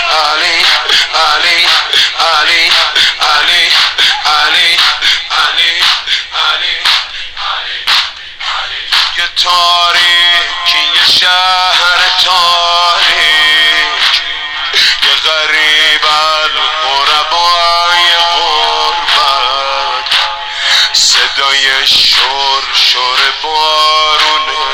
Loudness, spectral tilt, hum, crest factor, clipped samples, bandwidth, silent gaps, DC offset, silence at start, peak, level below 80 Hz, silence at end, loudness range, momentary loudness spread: -7 LUFS; 1.5 dB/octave; none; 10 dB; 0.5%; over 20 kHz; none; under 0.1%; 0 s; 0 dBFS; -42 dBFS; 0 s; 3 LU; 6 LU